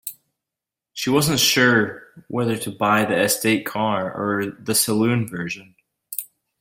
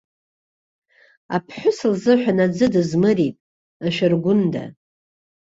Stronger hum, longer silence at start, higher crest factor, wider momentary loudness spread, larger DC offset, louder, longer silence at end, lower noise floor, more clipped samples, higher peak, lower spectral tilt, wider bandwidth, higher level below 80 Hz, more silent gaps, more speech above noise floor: neither; second, 0.05 s vs 1.3 s; about the same, 18 dB vs 18 dB; first, 15 LU vs 9 LU; neither; about the same, -20 LUFS vs -19 LUFS; second, 0.35 s vs 0.85 s; about the same, -87 dBFS vs under -90 dBFS; neither; about the same, -4 dBFS vs -4 dBFS; second, -3.5 dB/octave vs -7 dB/octave; first, 16.5 kHz vs 8 kHz; about the same, -58 dBFS vs -60 dBFS; second, none vs 3.40-3.80 s; second, 66 dB vs over 72 dB